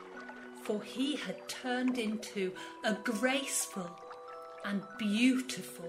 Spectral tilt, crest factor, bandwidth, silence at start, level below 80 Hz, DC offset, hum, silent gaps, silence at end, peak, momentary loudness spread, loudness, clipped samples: -3.5 dB/octave; 20 dB; 16 kHz; 0 s; -80 dBFS; under 0.1%; none; none; 0 s; -16 dBFS; 17 LU; -35 LUFS; under 0.1%